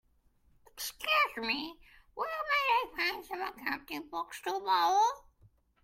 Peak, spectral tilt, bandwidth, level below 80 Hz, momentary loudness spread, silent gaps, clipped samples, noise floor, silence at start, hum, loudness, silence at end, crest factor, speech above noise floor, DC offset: -16 dBFS; -1 dB/octave; 16.5 kHz; -66 dBFS; 13 LU; none; under 0.1%; -68 dBFS; 0.75 s; none; -32 LUFS; 0.65 s; 18 dB; 35 dB; under 0.1%